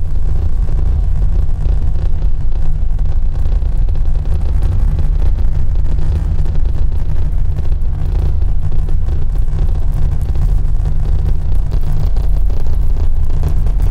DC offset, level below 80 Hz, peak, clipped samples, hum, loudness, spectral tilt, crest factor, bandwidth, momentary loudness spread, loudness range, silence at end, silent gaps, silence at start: under 0.1%; -12 dBFS; -2 dBFS; under 0.1%; none; -18 LUFS; -8.5 dB/octave; 8 dB; 2.6 kHz; 2 LU; 1 LU; 0 s; none; 0 s